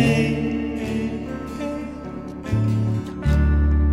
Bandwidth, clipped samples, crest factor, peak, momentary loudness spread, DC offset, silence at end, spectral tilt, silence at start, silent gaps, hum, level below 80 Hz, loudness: 11 kHz; under 0.1%; 16 dB; -6 dBFS; 13 LU; under 0.1%; 0 s; -7.5 dB/octave; 0 s; none; none; -26 dBFS; -23 LUFS